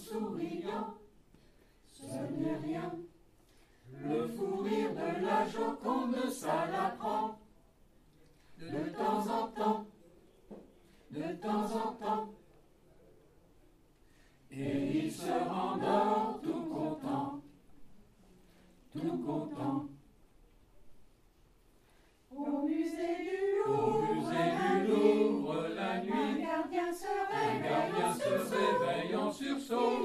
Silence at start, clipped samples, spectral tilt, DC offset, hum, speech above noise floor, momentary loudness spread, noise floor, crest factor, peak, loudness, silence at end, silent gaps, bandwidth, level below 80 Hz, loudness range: 0 s; under 0.1%; -6 dB/octave; under 0.1%; none; 31 dB; 12 LU; -65 dBFS; 20 dB; -16 dBFS; -34 LUFS; 0 s; none; 15 kHz; -68 dBFS; 10 LU